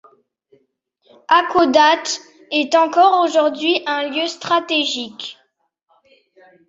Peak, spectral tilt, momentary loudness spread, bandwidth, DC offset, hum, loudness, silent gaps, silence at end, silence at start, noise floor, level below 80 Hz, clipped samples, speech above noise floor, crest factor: 0 dBFS; -2 dB/octave; 12 LU; 7.8 kHz; under 0.1%; none; -16 LUFS; none; 1.35 s; 1.3 s; -65 dBFS; -66 dBFS; under 0.1%; 49 dB; 18 dB